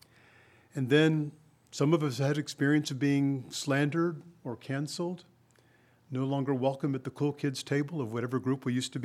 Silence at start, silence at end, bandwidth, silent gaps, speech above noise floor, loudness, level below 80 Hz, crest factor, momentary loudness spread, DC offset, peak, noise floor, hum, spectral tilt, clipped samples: 0.75 s; 0 s; 14.5 kHz; none; 34 dB; -31 LUFS; -78 dBFS; 20 dB; 11 LU; under 0.1%; -10 dBFS; -64 dBFS; none; -6 dB/octave; under 0.1%